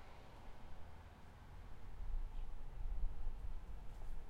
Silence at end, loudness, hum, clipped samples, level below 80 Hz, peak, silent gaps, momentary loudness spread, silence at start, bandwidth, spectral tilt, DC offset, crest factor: 0 s; -54 LUFS; none; under 0.1%; -46 dBFS; -28 dBFS; none; 10 LU; 0 s; 5.2 kHz; -6.5 dB/octave; under 0.1%; 16 dB